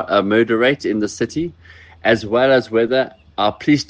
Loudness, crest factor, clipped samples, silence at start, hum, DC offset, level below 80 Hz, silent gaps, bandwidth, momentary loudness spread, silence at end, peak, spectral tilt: -17 LUFS; 16 dB; under 0.1%; 0 s; none; under 0.1%; -54 dBFS; none; 9.4 kHz; 8 LU; 0.05 s; -2 dBFS; -5.5 dB/octave